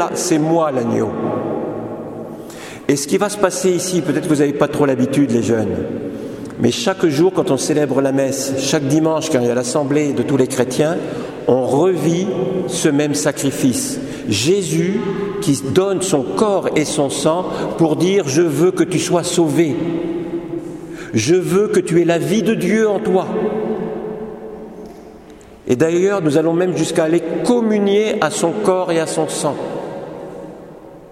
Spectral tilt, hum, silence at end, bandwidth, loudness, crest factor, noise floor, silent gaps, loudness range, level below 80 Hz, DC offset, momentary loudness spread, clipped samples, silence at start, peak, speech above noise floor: -5 dB/octave; none; 0 s; 16 kHz; -17 LUFS; 16 dB; -39 dBFS; none; 3 LU; -52 dBFS; under 0.1%; 12 LU; under 0.1%; 0 s; 0 dBFS; 24 dB